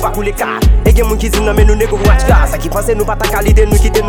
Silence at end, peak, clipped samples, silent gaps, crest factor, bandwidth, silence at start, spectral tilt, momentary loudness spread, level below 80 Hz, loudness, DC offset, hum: 0 s; 0 dBFS; 0.3%; none; 10 dB; 17 kHz; 0 s; -5.5 dB/octave; 6 LU; -12 dBFS; -12 LUFS; under 0.1%; none